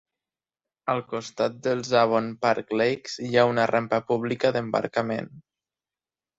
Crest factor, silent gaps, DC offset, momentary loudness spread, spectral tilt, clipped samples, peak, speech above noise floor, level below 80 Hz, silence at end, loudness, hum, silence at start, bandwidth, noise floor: 20 dB; none; under 0.1%; 9 LU; -5.5 dB/octave; under 0.1%; -6 dBFS; over 66 dB; -66 dBFS; 1 s; -25 LUFS; none; 0.85 s; 8 kHz; under -90 dBFS